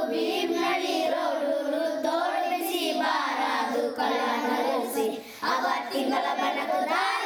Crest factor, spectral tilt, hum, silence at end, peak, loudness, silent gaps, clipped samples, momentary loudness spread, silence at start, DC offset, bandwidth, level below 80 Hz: 14 dB; -2 dB/octave; none; 0 s; -12 dBFS; -27 LUFS; none; under 0.1%; 2 LU; 0 s; under 0.1%; over 20 kHz; -78 dBFS